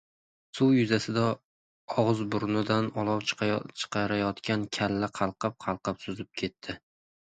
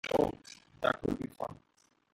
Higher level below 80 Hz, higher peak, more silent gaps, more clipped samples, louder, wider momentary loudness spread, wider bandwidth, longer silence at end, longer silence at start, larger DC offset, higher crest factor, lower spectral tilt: about the same, -60 dBFS vs -58 dBFS; first, -10 dBFS vs -14 dBFS; first, 1.44-1.88 s vs none; neither; first, -29 LUFS vs -35 LUFS; second, 11 LU vs 16 LU; second, 9.4 kHz vs 16.5 kHz; about the same, 0.5 s vs 0.6 s; first, 0.55 s vs 0.05 s; neither; about the same, 20 dB vs 22 dB; about the same, -6 dB/octave vs -5.5 dB/octave